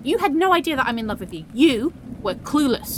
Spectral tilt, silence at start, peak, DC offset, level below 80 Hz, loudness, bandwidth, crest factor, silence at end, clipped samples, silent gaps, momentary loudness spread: -4.5 dB/octave; 0 s; -4 dBFS; under 0.1%; -46 dBFS; -21 LUFS; 17.5 kHz; 16 dB; 0 s; under 0.1%; none; 11 LU